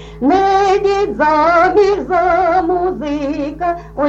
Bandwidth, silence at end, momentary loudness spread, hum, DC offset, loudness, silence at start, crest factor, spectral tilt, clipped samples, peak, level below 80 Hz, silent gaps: 8 kHz; 0 s; 9 LU; none; under 0.1%; -14 LUFS; 0 s; 12 dB; -5.5 dB/octave; under 0.1%; -2 dBFS; -36 dBFS; none